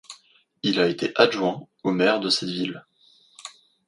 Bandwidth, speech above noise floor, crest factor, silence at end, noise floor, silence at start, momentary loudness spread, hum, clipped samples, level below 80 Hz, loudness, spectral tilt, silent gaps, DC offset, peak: 11.5 kHz; 36 dB; 24 dB; 0.4 s; -59 dBFS; 0.1 s; 21 LU; none; under 0.1%; -68 dBFS; -23 LUFS; -4.5 dB/octave; none; under 0.1%; -2 dBFS